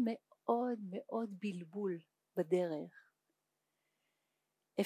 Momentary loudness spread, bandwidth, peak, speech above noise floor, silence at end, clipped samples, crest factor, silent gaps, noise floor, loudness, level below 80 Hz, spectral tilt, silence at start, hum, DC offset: 9 LU; 15 kHz; -20 dBFS; 47 dB; 0 s; under 0.1%; 22 dB; none; -86 dBFS; -40 LUFS; under -90 dBFS; -7.5 dB/octave; 0 s; none; under 0.1%